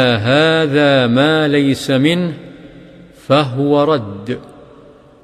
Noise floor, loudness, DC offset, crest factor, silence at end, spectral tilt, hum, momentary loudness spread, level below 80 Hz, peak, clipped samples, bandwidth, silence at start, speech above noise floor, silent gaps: -42 dBFS; -13 LUFS; under 0.1%; 14 dB; 0.8 s; -6 dB/octave; none; 13 LU; -52 dBFS; 0 dBFS; under 0.1%; 13.5 kHz; 0 s; 29 dB; none